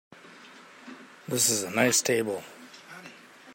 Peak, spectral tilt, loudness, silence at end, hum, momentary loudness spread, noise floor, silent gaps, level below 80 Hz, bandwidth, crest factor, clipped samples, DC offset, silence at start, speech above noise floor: -8 dBFS; -2 dB/octave; -25 LUFS; 0 s; none; 25 LU; -50 dBFS; none; -76 dBFS; 16.5 kHz; 24 dB; under 0.1%; under 0.1%; 0.25 s; 24 dB